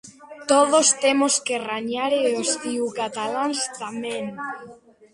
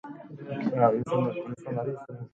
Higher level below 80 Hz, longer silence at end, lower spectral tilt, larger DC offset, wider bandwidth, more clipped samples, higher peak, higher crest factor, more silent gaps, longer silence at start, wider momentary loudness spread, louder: about the same, -70 dBFS vs -68 dBFS; first, 0.4 s vs 0.05 s; second, -1.5 dB/octave vs -9 dB/octave; neither; first, 11.5 kHz vs 8.8 kHz; neither; first, -4 dBFS vs -8 dBFS; about the same, 18 dB vs 20 dB; neither; about the same, 0.05 s vs 0.05 s; about the same, 14 LU vs 16 LU; first, -22 LUFS vs -28 LUFS